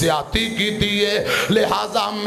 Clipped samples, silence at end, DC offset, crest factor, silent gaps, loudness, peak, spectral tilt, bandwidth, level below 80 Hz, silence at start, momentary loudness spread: under 0.1%; 0 s; under 0.1%; 12 dB; none; -19 LUFS; -6 dBFS; -4 dB/octave; 15.5 kHz; -40 dBFS; 0 s; 3 LU